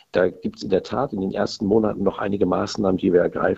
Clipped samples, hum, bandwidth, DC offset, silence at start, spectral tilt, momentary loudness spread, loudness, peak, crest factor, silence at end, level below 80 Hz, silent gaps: under 0.1%; none; 8 kHz; under 0.1%; 0.15 s; -6.5 dB/octave; 6 LU; -22 LUFS; -4 dBFS; 18 dB; 0 s; -50 dBFS; none